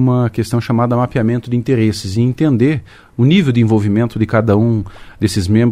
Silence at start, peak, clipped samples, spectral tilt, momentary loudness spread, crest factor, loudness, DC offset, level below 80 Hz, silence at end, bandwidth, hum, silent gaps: 0 s; 0 dBFS; under 0.1%; -7.5 dB/octave; 6 LU; 14 dB; -15 LUFS; under 0.1%; -42 dBFS; 0 s; 13.5 kHz; none; none